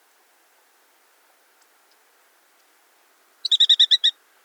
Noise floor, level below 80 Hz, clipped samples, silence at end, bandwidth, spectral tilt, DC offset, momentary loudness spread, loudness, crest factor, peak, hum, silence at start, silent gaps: -60 dBFS; under -90 dBFS; under 0.1%; 0.35 s; over 20 kHz; 7 dB/octave; under 0.1%; 9 LU; -16 LUFS; 20 dB; -6 dBFS; none; 3.5 s; none